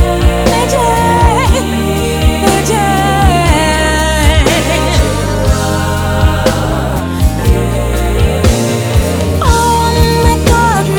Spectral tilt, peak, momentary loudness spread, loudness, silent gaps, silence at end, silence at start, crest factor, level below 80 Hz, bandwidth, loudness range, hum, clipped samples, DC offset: -5 dB/octave; 0 dBFS; 4 LU; -11 LUFS; none; 0 s; 0 s; 10 dB; -16 dBFS; 19.5 kHz; 2 LU; none; under 0.1%; under 0.1%